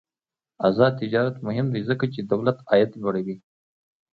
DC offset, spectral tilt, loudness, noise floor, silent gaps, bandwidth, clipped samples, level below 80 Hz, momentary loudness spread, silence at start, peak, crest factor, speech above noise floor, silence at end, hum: under 0.1%; -9.5 dB/octave; -23 LUFS; under -90 dBFS; none; 5 kHz; under 0.1%; -64 dBFS; 7 LU; 0.6 s; -4 dBFS; 20 dB; over 67 dB; 0.75 s; none